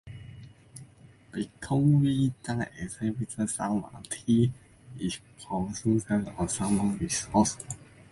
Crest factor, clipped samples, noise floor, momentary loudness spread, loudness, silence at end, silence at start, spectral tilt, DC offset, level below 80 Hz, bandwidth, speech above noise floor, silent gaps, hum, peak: 18 dB; under 0.1%; -54 dBFS; 21 LU; -29 LUFS; 0.25 s; 0.05 s; -5.5 dB/octave; under 0.1%; -52 dBFS; 11.5 kHz; 26 dB; none; none; -10 dBFS